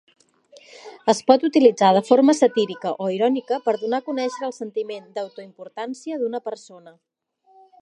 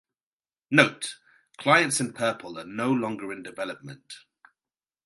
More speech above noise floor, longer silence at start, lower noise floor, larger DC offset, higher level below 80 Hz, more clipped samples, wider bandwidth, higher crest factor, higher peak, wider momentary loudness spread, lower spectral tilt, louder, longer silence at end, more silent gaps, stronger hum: second, 38 dB vs over 64 dB; first, 0.85 s vs 0.7 s; second, -58 dBFS vs under -90 dBFS; neither; about the same, -78 dBFS vs -74 dBFS; neither; about the same, 11 kHz vs 12 kHz; second, 20 dB vs 26 dB; about the same, 0 dBFS vs -2 dBFS; second, 18 LU vs 21 LU; first, -5 dB/octave vs -3.5 dB/octave; first, -20 LUFS vs -25 LUFS; about the same, 0.9 s vs 0.85 s; neither; neither